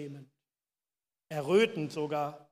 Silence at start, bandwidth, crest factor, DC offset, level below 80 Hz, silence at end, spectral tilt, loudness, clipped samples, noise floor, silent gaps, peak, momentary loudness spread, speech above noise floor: 0 s; 15 kHz; 20 dB; under 0.1%; -84 dBFS; 0.15 s; -5.5 dB/octave; -31 LUFS; under 0.1%; under -90 dBFS; none; -14 dBFS; 17 LU; over 59 dB